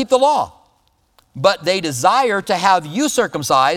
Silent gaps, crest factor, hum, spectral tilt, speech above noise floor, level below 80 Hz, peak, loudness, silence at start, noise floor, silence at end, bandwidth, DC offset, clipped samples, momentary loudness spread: none; 16 dB; none; -3.5 dB/octave; 44 dB; -56 dBFS; 0 dBFS; -16 LUFS; 0 s; -60 dBFS; 0 s; 17.5 kHz; under 0.1%; under 0.1%; 5 LU